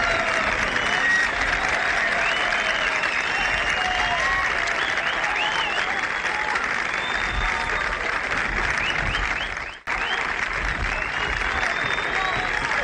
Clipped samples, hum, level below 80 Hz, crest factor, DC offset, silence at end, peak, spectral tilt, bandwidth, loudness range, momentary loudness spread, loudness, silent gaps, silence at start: under 0.1%; none; -38 dBFS; 14 dB; under 0.1%; 0 s; -8 dBFS; -2.5 dB/octave; 11 kHz; 3 LU; 4 LU; -22 LUFS; none; 0 s